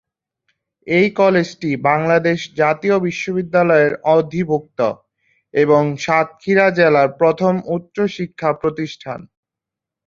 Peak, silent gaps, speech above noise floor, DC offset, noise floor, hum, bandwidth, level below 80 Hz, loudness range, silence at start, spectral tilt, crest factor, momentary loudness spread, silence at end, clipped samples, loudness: -2 dBFS; none; 69 dB; under 0.1%; -85 dBFS; none; 7.6 kHz; -58 dBFS; 1 LU; 0.85 s; -6.5 dB/octave; 16 dB; 9 LU; 0.8 s; under 0.1%; -17 LUFS